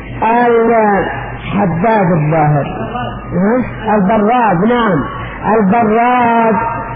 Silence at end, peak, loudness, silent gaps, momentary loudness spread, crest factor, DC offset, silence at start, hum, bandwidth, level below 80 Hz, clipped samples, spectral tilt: 0 s; -2 dBFS; -12 LUFS; none; 9 LU; 10 dB; under 0.1%; 0 s; none; 4.9 kHz; -34 dBFS; under 0.1%; -11.5 dB/octave